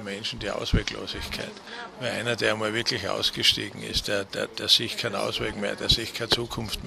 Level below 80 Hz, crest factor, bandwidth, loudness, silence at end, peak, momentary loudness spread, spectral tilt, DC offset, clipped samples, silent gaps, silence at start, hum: -40 dBFS; 22 dB; 14.5 kHz; -26 LUFS; 0 s; -6 dBFS; 12 LU; -3 dB/octave; under 0.1%; under 0.1%; none; 0 s; none